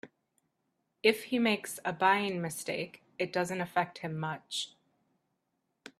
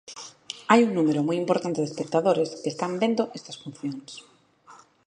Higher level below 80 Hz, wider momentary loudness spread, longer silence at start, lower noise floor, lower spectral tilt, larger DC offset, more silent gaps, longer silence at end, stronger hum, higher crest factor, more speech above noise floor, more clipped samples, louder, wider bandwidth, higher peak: about the same, -76 dBFS vs -74 dBFS; second, 10 LU vs 19 LU; about the same, 0.05 s vs 0.1 s; first, -81 dBFS vs -53 dBFS; second, -4 dB/octave vs -5.5 dB/octave; neither; neither; second, 0.1 s vs 0.3 s; neither; about the same, 24 dB vs 24 dB; first, 49 dB vs 28 dB; neither; second, -32 LUFS vs -25 LUFS; first, 15 kHz vs 10 kHz; second, -10 dBFS vs -2 dBFS